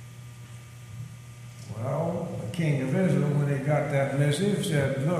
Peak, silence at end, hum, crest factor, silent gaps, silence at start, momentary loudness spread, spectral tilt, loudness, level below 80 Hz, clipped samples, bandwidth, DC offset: -12 dBFS; 0 s; none; 16 dB; none; 0 s; 20 LU; -6.5 dB/octave; -27 LUFS; -60 dBFS; under 0.1%; 13.5 kHz; under 0.1%